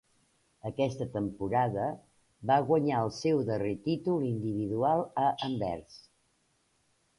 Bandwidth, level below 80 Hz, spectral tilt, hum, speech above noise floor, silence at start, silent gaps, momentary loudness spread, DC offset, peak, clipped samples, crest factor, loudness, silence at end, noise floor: 11.5 kHz; -62 dBFS; -7 dB/octave; none; 43 dB; 0.65 s; none; 9 LU; under 0.1%; -12 dBFS; under 0.1%; 18 dB; -31 LUFS; 1.2 s; -73 dBFS